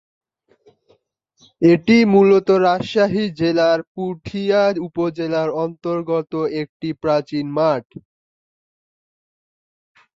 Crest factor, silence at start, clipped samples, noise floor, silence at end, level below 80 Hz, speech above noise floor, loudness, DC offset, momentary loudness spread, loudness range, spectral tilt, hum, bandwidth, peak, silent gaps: 18 dB; 1.6 s; under 0.1%; -62 dBFS; 2.35 s; -58 dBFS; 44 dB; -18 LUFS; under 0.1%; 12 LU; 8 LU; -7 dB/octave; none; 7.6 kHz; -2 dBFS; 3.87-3.95 s, 6.69-6.80 s